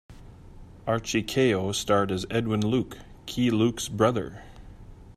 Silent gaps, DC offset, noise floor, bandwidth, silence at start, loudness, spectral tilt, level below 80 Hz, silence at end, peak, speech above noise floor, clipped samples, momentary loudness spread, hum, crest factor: none; under 0.1%; -46 dBFS; 15.5 kHz; 0.1 s; -26 LUFS; -5 dB/octave; -50 dBFS; 0.05 s; -8 dBFS; 21 dB; under 0.1%; 14 LU; none; 20 dB